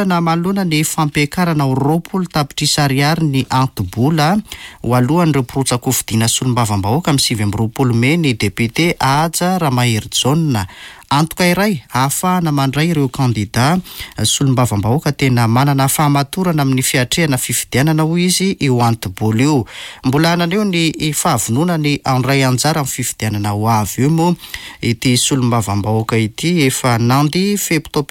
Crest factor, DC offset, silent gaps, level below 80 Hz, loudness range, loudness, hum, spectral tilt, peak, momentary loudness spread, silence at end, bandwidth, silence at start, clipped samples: 12 dB; under 0.1%; none; -42 dBFS; 1 LU; -15 LUFS; none; -4.5 dB/octave; -2 dBFS; 5 LU; 0.05 s; 17 kHz; 0 s; under 0.1%